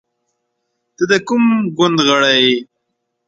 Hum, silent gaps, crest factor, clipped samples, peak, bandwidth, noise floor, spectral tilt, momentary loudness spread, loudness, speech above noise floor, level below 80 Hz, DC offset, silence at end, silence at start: none; none; 16 dB; under 0.1%; 0 dBFS; 7.8 kHz; -72 dBFS; -4 dB/octave; 6 LU; -13 LUFS; 59 dB; -60 dBFS; under 0.1%; 0.65 s; 1 s